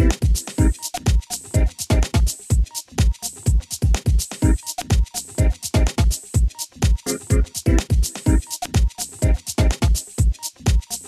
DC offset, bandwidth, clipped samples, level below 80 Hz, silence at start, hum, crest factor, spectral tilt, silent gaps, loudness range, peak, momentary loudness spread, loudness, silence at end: under 0.1%; 13.5 kHz; under 0.1%; -20 dBFS; 0 s; none; 16 dB; -5 dB/octave; none; 1 LU; -4 dBFS; 4 LU; -21 LUFS; 0 s